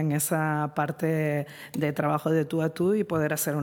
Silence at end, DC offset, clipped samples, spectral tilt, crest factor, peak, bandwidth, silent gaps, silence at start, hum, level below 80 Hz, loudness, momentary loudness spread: 0 s; under 0.1%; under 0.1%; -6 dB/octave; 16 dB; -10 dBFS; 19 kHz; none; 0 s; none; -70 dBFS; -27 LUFS; 4 LU